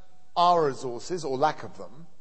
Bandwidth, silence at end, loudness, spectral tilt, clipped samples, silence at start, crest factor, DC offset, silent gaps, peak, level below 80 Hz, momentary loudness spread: 8.8 kHz; 0.15 s; -26 LUFS; -5 dB/octave; under 0.1%; 0.35 s; 18 dB; 1%; none; -10 dBFS; -66 dBFS; 21 LU